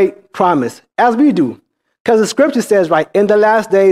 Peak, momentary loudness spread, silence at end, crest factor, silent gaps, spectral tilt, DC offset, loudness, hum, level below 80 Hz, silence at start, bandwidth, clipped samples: 0 dBFS; 6 LU; 0 s; 12 dB; 2.00-2.05 s; -5.5 dB/octave; under 0.1%; -13 LUFS; none; -60 dBFS; 0 s; 15 kHz; under 0.1%